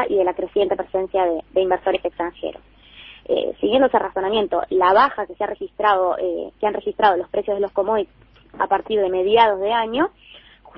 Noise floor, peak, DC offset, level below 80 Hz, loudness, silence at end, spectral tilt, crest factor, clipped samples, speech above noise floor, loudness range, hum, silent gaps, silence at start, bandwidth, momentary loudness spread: -44 dBFS; -2 dBFS; under 0.1%; -52 dBFS; -20 LUFS; 0.4 s; -8 dB/octave; 18 dB; under 0.1%; 24 dB; 3 LU; none; none; 0 s; 5.6 kHz; 10 LU